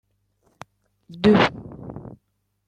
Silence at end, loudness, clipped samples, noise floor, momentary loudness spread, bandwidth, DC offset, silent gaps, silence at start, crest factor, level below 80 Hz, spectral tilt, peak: 0.65 s; -19 LUFS; under 0.1%; -71 dBFS; 22 LU; 9 kHz; under 0.1%; none; 1.15 s; 20 dB; -52 dBFS; -7 dB/octave; -4 dBFS